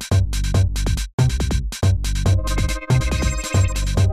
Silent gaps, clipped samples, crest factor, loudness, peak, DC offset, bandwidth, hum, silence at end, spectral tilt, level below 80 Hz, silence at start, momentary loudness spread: 1.13-1.18 s; under 0.1%; 12 dB; -21 LUFS; -6 dBFS; 1%; 14.5 kHz; none; 0 s; -5 dB/octave; -22 dBFS; 0 s; 3 LU